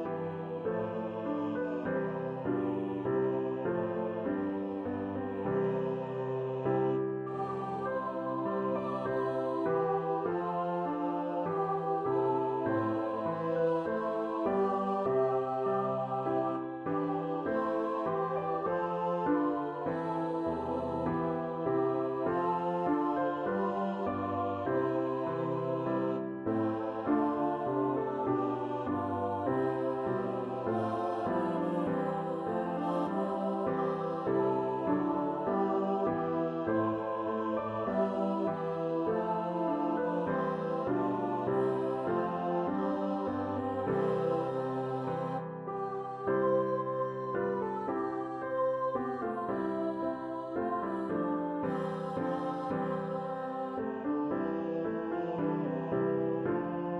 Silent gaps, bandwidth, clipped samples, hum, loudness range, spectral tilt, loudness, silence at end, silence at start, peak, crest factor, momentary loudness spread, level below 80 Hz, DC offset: none; 7.8 kHz; under 0.1%; none; 3 LU; -9 dB/octave; -33 LUFS; 0 s; 0 s; -18 dBFS; 14 dB; 5 LU; -66 dBFS; under 0.1%